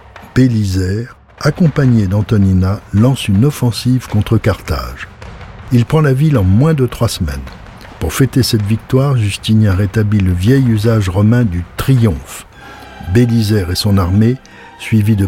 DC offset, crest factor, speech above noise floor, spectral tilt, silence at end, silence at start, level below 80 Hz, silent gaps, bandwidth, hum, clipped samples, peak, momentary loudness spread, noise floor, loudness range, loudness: under 0.1%; 12 dB; 22 dB; -7 dB/octave; 0 s; 0.15 s; -32 dBFS; none; 16.5 kHz; none; under 0.1%; -2 dBFS; 16 LU; -34 dBFS; 2 LU; -13 LUFS